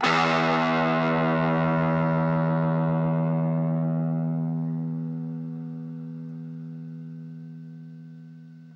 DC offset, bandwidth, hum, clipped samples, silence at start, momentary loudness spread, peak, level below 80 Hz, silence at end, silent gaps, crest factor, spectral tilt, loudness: under 0.1%; 7.4 kHz; none; under 0.1%; 0 s; 19 LU; -10 dBFS; -62 dBFS; 0 s; none; 16 dB; -7.5 dB/octave; -25 LUFS